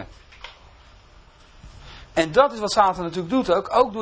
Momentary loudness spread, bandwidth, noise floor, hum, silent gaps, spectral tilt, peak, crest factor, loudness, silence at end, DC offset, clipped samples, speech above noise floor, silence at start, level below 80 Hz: 23 LU; 8 kHz; -50 dBFS; none; none; -4.5 dB/octave; -2 dBFS; 20 dB; -21 LUFS; 0 s; under 0.1%; under 0.1%; 30 dB; 0 s; -48 dBFS